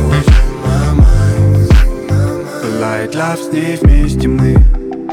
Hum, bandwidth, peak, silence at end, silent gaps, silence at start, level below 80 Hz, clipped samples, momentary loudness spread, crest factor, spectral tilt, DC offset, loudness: none; 14 kHz; 0 dBFS; 0 s; none; 0 s; -12 dBFS; under 0.1%; 7 LU; 10 dB; -7 dB/octave; under 0.1%; -12 LUFS